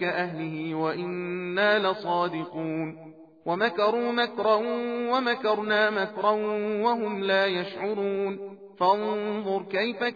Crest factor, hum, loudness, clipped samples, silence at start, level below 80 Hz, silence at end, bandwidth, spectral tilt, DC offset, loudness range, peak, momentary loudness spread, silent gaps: 16 dB; none; -26 LUFS; under 0.1%; 0 s; -78 dBFS; 0 s; 5 kHz; -7 dB/octave; under 0.1%; 2 LU; -10 dBFS; 8 LU; none